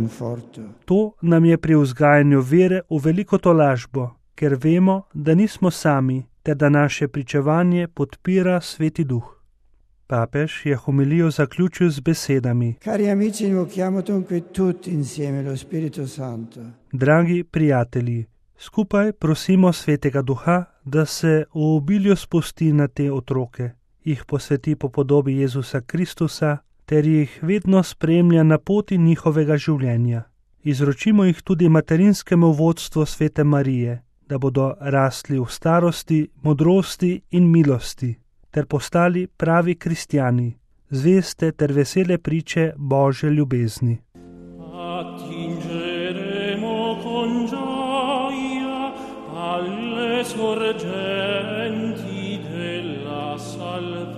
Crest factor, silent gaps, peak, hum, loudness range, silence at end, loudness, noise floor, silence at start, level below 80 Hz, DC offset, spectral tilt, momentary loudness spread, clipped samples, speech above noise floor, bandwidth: 16 dB; none; -2 dBFS; none; 7 LU; 0 s; -20 LUFS; -56 dBFS; 0 s; -50 dBFS; under 0.1%; -7 dB/octave; 12 LU; under 0.1%; 37 dB; 14 kHz